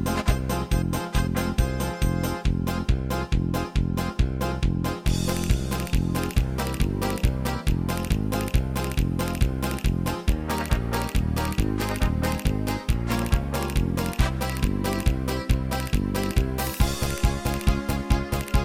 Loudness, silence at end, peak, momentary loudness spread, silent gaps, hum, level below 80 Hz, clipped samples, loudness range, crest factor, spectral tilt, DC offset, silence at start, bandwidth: -26 LUFS; 0 s; -6 dBFS; 1 LU; none; none; -28 dBFS; under 0.1%; 0 LU; 18 dB; -5.5 dB/octave; under 0.1%; 0 s; 16.5 kHz